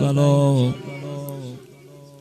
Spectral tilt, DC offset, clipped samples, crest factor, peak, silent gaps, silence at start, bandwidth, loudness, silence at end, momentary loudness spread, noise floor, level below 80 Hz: -7.5 dB/octave; under 0.1%; under 0.1%; 16 dB; -6 dBFS; none; 0 s; 14 kHz; -20 LUFS; 0.1 s; 19 LU; -44 dBFS; -60 dBFS